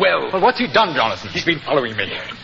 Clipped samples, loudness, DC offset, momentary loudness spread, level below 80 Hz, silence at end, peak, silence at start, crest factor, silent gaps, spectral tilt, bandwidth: under 0.1%; -18 LUFS; under 0.1%; 7 LU; -50 dBFS; 0 s; -2 dBFS; 0 s; 16 dB; none; -4.5 dB/octave; 7.6 kHz